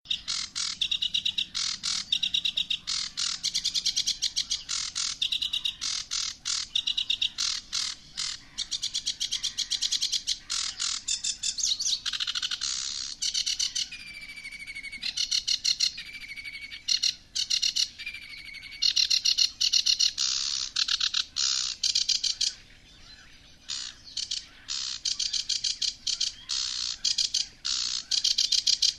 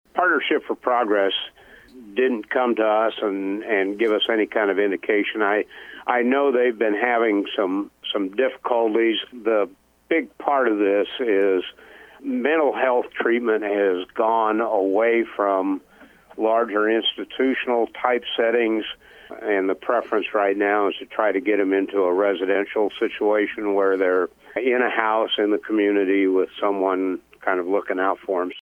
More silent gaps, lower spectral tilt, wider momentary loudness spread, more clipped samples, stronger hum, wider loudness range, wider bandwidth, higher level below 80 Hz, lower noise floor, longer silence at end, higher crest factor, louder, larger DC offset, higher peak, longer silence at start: neither; second, 3 dB/octave vs -6 dB/octave; first, 12 LU vs 6 LU; neither; neither; first, 5 LU vs 2 LU; first, 13 kHz vs 4.2 kHz; first, -58 dBFS vs -66 dBFS; about the same, -52 dBFS vs -49 dBFS; about the same, 0 s vs 0 s; about the same, 22 dB vs 20 dB; second, -26 LUFS vs -21 LUFS; neither; second, -8 dBFS vs -2 dBFS; about the same, 0.05 s vs 0.15 s